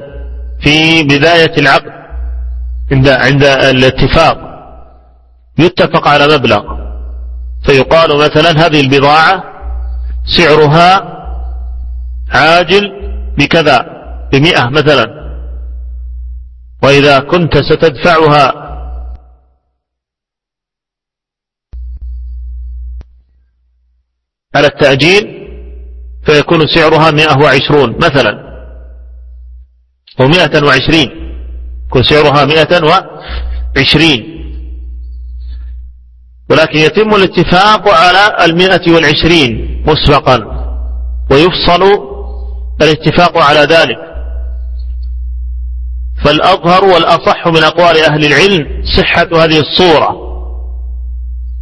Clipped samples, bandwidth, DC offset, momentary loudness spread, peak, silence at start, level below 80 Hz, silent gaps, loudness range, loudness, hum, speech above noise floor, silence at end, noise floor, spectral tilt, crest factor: 1%; 11 kHz; under 0.1%; 20 LU; 0 dBFS; 0 s; -24 dBFS; none; 5 LU; -7 LUFS; none; 76 dB; 0 s; -83 dBFS; -5.5 dB/octave; 10 dB